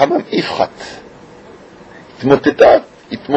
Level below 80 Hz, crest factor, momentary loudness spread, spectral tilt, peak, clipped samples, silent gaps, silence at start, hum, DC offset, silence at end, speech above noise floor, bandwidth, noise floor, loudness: -48 dBFS; 14 dB; 22 LU; -6 dB/octave; 0 dBFS; 0.1%; none; 0 s; none; under 0.1%; 0 s; 26 dB; 8.4 kHz; -38 dBFS; -13 LUFS